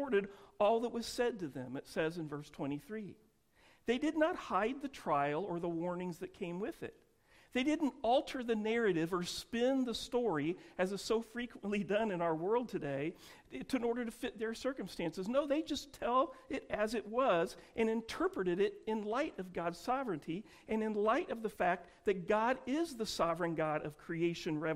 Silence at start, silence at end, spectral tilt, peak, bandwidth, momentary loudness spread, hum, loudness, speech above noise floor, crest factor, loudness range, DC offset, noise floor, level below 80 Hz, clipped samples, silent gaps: 0 s; 0 s; -5.5 dB/octave; -20 dBFS; 16 kHz; 10 LU; none; -37 LUFS; 32 dB; 16 dB; 3 LU; under 0.1%; -68 dBFS; -66 dBFS; under 0.1%; none